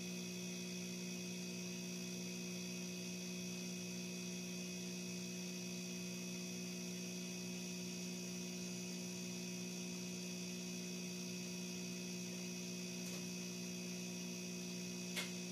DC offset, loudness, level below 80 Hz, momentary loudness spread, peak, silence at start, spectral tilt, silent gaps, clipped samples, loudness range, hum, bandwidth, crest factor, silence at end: under 0.1%; -46 LUFS; -82 dBFS; 0 LU; -30 dBFS; 0 s; -3.5 dB/octave; none; under 0.1%; 0 LU; 60 Hz at -50 dBFS; 15.5 kHz; 16 dB; 0 s